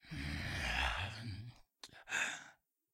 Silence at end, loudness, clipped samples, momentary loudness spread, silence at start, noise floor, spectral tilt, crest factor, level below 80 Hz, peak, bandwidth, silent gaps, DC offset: 0.4 s; -40 LUFS; under 0.1%; 20 LU; 0.05 s; -65 dBFS; -3 dB/octave; 20 dB; -52 dBFS; -22 dBFS; 16 kHz; none; under 0.1%